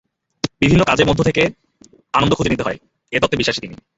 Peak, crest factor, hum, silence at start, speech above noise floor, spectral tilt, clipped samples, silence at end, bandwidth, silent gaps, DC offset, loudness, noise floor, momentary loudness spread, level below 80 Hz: -2 dBFS; 16 dB; none; 0.45 s; 34 dB; -5.5 dB/octave; under 0.1%; 0.2 s; 8 kHz; none; under 0.1%; -17 LUFS; -50 dBFS; 12 LU; -38 dBFS